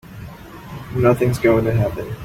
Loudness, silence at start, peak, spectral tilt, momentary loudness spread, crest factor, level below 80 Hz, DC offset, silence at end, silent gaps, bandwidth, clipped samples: -18 LUFS; 0.05 s; -2 dBFS; -8 dB/octave; 21 LU; 16 dB; -40 dBFS; under 0.1%; 0 s; none; 16 kHz; under 0.1%